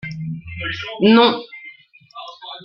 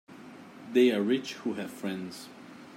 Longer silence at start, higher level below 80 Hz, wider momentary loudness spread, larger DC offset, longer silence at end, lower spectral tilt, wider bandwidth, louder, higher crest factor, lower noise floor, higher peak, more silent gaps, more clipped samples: about the same, 0.05 s vs 0.1 s; first, -54 dBFS vs -82 dBFS; about the same, 24 LU vs 24 LU; neither; about the same, 0 s vs 0 s; first, -7 dB/octave vs -5.5 dB/octave; second, 6.2 kHz vs 15.5 kHz; first, -17 LUFS vs -29 LUFS; about the same, 18 dB vs 18 dB; second, -44 dBFS vs -48 dBFS; first, -2 dBFS vs -12 dBFS; neither; neither